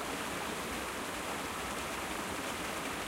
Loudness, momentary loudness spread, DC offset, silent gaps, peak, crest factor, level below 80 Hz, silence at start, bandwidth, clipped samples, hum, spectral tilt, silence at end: -37 LUFS; 1 LU; under 0.1%; none; -24 dBFS; 14 dB; -56 dBFS; 0 s; 16 kHz; under 0.1%; none; -2.5 dB/octave; 0 s